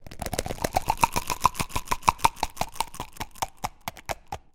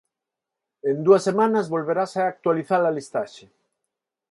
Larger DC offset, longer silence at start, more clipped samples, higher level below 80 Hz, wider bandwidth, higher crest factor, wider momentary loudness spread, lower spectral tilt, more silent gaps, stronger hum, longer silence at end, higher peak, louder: neither; second, 0 s vs 0.85 s; neither; first, -40 dBFS vs -72 dBFS; first, 17 kHz vs 11.5 kHz; first, 28 dB vs 20 dB; about the same, 12 LU vs 12 LU; second, -3 dB/octave vs -6.5 dB/octave; neither; neither; second, 0.15 s vs 0.95 s; first, 0 dBFS vs -4 dBFS; second, -28 LUFS vs -22 LUFS